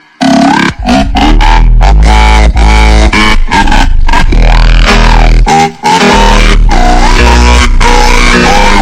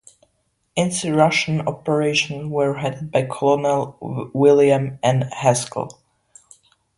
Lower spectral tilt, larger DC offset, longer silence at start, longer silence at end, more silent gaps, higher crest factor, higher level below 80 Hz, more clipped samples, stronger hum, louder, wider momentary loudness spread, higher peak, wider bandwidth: about the same, -4.5 dB/octave vs -5 dB/octave; neither; second, 0.2 s vs 0.75 s; second, 0 s vs 1.05 s; neither; second, 4 dB vs 20 dB; first, -4 dBFS vs -58 dBFS; first, 4% vs under 0.1%; neither; first, -6 LUFS vs -19 LUFS; second, 3 LU vs 12 LU; about the same, 0 dBFS vs 0 dBFS; about the same, 11 kHz vs 11.5 kHz